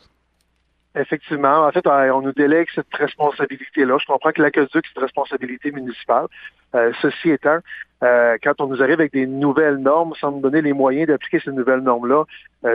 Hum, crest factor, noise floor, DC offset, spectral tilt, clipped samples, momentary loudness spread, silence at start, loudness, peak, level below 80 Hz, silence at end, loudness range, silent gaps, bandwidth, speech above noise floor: none; 16 dB; -65 dBFS; under 0.1%; -9 dB/octave; under 0.1%; 9 LU; 0.95 s; -18 LUFS; -2 dBFS; -64 dBFS; 0 s; 3 LU; none; 5 kHz; 47 dB